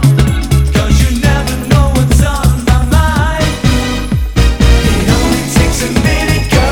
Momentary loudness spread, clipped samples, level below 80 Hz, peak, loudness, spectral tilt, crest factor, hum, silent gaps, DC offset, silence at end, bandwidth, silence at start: 3 LU; 0.4%; -14 dBFS; 0 dBFS; -11 LUFS; -5.5 dB/octave; 10 dB; none; none; under 0.1%; 0 s; 18.5 kHz; 0 s